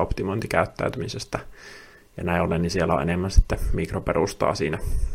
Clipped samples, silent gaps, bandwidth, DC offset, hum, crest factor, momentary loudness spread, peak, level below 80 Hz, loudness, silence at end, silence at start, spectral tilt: under 0.1%; none; 15.5 kHz; under 0.1%; none; 20 dB; 14 LU; -2 dBFS; -30 dBFS; -25 LUFS; 0 s; 0 s; -6 dB/octave